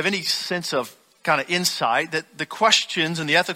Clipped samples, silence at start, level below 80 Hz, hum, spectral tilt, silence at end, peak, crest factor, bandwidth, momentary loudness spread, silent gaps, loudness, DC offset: under 0.1%; 0 s; -66 dBFS; none; -2.5 dB/octave; 0 s; -2 dBFS; 22 dB; 16.5 kHz; 10 LU; none; -21 LUFS; under 0.1%